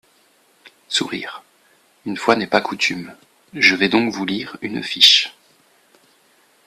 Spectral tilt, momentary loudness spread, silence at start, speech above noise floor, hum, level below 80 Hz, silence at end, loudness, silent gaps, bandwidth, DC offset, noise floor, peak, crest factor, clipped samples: -2.5 dB/octave; 22 LU; 0.65 s; 39 dB; none; -64 dBFS; 1.35 s; -17 LUFS; none; 15.5 kHz; under 0.1%; -57 dBFS; 0 dBFS; 22 dB; under 0.1%